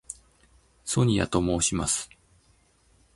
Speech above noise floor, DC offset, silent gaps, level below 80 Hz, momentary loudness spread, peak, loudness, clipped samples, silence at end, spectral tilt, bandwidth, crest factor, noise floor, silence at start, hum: 38 dB; under 0.1%; none; -46 dBFS; 19 LU; -8 dBFS; -25 LUFS; under 0.1%; 1.1 s; -4.5 dB/octave; 11.5 kHz; 20 dB; -63 dBFS; 0.1 s; none